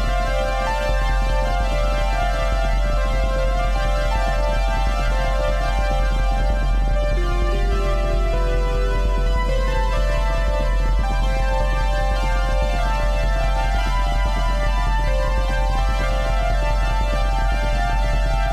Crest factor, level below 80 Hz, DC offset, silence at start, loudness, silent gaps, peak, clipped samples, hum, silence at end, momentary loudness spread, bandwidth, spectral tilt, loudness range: 8 dB; -20 dBFS; 0.1%; 0 s; -22 LUFS; none; -10 dBFS; under 0.1%; none; 0 s; 0 LU; 10 kHz; -5.5 dB/octave; 0 LU